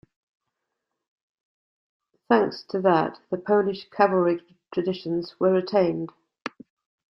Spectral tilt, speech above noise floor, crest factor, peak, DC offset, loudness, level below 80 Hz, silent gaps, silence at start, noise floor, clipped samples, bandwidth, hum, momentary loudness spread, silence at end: -8 dB/octave; 59 dB; 22 dB; -4 dBFS; under 0.1%; -24 LUFS; -68 dBFS; none; 2.3 s; -82 dBFS; under 0.1%; 6 kHz; none; 15 LU; 0.6 s